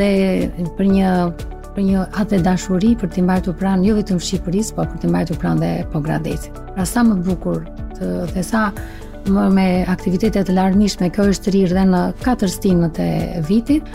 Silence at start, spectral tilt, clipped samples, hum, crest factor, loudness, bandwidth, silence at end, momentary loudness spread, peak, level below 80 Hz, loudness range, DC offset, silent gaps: 0 s; -6.5 dB/octave; under 0.1%; none; 12 dB; -18 LUFS; 15 kHz; 0 s; 8 LU; -4 dBFS; -30 dBFS; 4 LU; 0.4%; none